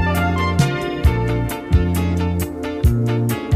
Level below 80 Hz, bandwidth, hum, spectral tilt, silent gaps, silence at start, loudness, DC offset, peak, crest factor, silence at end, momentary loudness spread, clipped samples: -24 dBFS; 15.5 kHz; none; -6.5 dB/octave; none; 0 s; -19 LUFS; under 0.1%; -4 dBFS; 14 dB; 0 s; 4 LU; under 0.1%